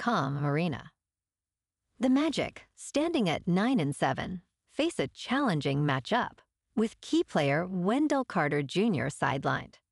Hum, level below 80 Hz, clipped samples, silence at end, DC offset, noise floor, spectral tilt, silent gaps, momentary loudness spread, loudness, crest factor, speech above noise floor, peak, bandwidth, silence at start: none; -62 dBFS; under 0.1%; 0.25 s; under 0.1%; under -90 dBFS; -6 dB/octave; none; 8 LU; -30 LUFS; 16 dB; over 61 dB; -14 dBFS; 12 kHz; 0 s